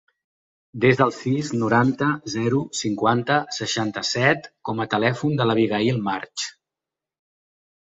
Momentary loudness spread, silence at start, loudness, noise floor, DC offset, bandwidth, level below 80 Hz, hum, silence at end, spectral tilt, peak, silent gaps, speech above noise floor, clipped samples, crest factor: 8 LU; 0.75 s; -22 LUFS; -88 dBFS; under 0.1%; 8 kHz; -60 dBFS; none; 1.4 s; -5 dB/octave; -4 dBFS; none; 66 dB; under 0.1%; 20 dB